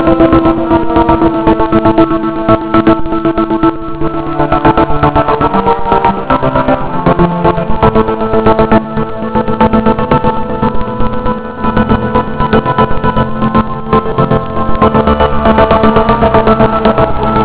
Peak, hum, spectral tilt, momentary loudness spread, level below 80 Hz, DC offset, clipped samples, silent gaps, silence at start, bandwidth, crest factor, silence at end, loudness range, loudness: 0 dBFS; none; -11 dB/octave; 6 LU; -22 dBFS; under 0.1%; 2%; none; 0 s; 4 kHz; 10 dB; 0 s; 3 LU; -10 LUFS